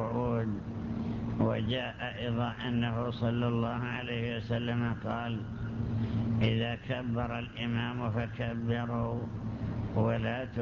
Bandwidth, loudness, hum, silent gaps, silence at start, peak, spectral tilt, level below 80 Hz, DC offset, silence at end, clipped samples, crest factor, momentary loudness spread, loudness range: 6.6 kHz; -33 LUFS; none; none; 0 s; -14 dBFS; -8.5 dB/octave; -48 dBFS; under 0.1%; 0 s; under 0.1%; 18 dB; 6 LU; 1 LU